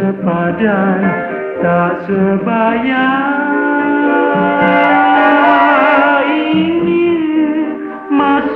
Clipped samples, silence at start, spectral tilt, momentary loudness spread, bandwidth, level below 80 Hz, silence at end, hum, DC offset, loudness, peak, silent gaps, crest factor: under 0.1%; 0 s; -9 dB/octave; 7 LU; 4.8 kHz; -50 dBFS; 0 s; none; under 0.1%; -12 LUFS; 0 dBFS; none; 12 dB